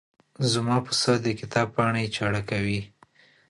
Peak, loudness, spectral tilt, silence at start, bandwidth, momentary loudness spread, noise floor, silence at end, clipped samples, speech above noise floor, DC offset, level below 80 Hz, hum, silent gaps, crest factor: -8 dBFS; -25 LUFS; -4.5 dB/octave; 0.4 s; 11.5 kHz; 6 LU; -58 dBFS; 0.65 s; under 0.1%; 33 dB; under 0.1%; -54 dBFS; none; none; 18 dB